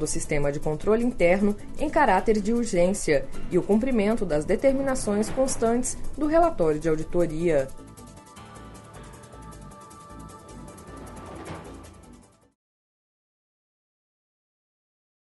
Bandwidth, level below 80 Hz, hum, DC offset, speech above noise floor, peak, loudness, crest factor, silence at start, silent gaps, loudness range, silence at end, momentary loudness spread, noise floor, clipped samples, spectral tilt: 11.5 kHz; -38 dBFS; none; under 0.1%; 29 dB; -8 dBFS; -24 LUFS; 18 dB; 0 s; none; 21 LU; 3.05 s; 23 LU; -52 dBFS; under 0.1%; -5.5 dB/octave